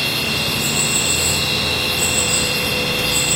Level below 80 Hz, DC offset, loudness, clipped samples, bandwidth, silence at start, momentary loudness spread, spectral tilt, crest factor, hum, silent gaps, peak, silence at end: -38 dBFS; under 0.1%; -16 LUFS; under 0.1%; 16 kHz; 0 s; 3 LU; -1.5 dB/octave; 16 dB; none; none; -4 dBFS; 0 s